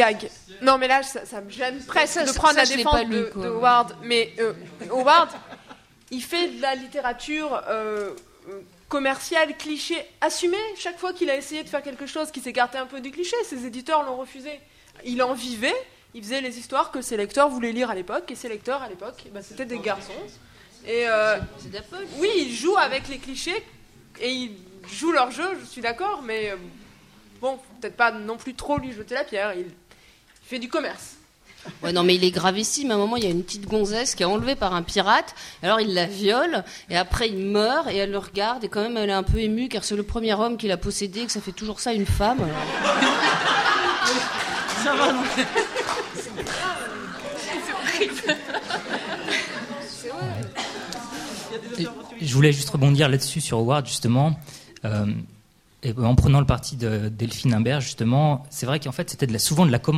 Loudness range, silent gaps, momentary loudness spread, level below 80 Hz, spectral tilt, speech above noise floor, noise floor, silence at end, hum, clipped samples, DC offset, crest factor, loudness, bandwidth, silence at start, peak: 7 LU; none; 14 LU; -42 dBFS; -4.5 dB/octave; 31 dB; -55 dBFS; 0 s; none; under 0.1%; under 0.1%; 22 dB; -24 LUFS; 15.5 kHz; 0 s; -2 dBFS